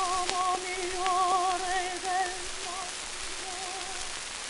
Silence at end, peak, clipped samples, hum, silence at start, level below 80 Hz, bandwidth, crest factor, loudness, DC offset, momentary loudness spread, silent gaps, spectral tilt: 0 s; -4 dBFS; under 0.1%; none; 0 s; -52 dBFS; 12 kHz; 28 dB; -30 LUFS; under 0.1%; 8 LU; none; -0.5 dB/octave